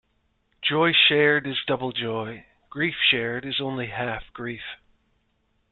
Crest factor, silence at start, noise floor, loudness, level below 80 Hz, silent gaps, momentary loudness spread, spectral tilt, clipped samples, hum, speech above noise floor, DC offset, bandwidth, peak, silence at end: 20 dB; 0.6 s; -70 dBFS; -23 LUFS; -58 dBFS; none; 19 LU; -8.5 dB/octave; under 0.1%; none; 45 dB; under 0.1%; 4.4 kHz; -6 dBFS; 0.95 s